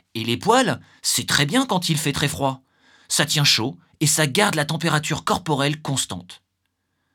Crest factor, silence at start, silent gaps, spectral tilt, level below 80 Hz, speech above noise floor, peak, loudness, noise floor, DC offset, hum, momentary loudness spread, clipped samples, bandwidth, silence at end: 22 dB; 0.15 s; none; -3.5 dB/octave; -56 dBFS; 53 dB; 0 dBFS; -20 LUFS; -74 dBFS; under 0.1%; none; 8 LU; under 0.1%; 19 kHz; 0.8 s